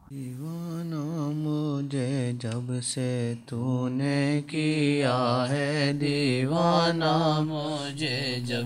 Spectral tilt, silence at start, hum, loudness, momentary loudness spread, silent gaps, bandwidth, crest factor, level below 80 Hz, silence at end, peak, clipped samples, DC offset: -5.5 dB/octave; 0.1 s; none; -27 LUFS; 9 LU; none; 15 kHz; 18 dB; -66 dBFS; 0 s; -10 dBFS; under 0.1%; under 0.1%